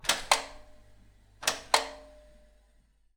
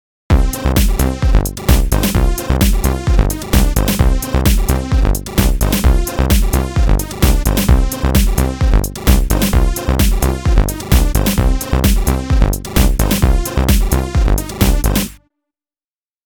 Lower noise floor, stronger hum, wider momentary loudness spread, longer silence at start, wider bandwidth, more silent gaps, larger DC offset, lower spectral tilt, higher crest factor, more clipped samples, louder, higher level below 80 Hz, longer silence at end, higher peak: second, -65 dBFS vs under -90 dBFS; neither; first, 19 LU vs 3 LU; second, 0.05 s vs 0.3 s; about the same, over 20 kHz vs over 20 kHz; neither; neither; second, 0.5 dB/octave vs -5 dB/octave; first, 30 dB vs 12 dB; neither; second, -29 LUFS vs -15 LUFS; second, -56 dBFS vs -14 dBFS; about the same, 1.05 s vs 1.1 s; second, -4 dBFS vs 0 dBFS